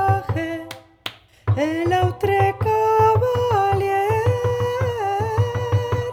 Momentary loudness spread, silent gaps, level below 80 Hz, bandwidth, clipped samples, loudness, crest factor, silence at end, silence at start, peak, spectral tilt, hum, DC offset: 14 LU; none; -44 dBFS; 16 kHz; under 0.1%; -20 LUFS; 14 dB; 0 s; 0 s; -6 dBFS; -7 dB/octave; none; under 0.1%